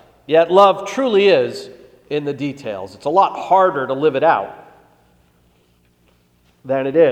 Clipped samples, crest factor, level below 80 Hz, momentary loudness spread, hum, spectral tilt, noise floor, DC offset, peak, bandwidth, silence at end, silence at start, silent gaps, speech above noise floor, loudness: under 0.1%; 18 dB; -62 dBFS; 13 LU; 60 Hz at -55 dBFS; -5.5 dB/octave; -57 dBFS; under 0.1%; 0 dBFS; 9.8 kHz; 0 s; 0.3 s; none; 42 dB; -16 LUFS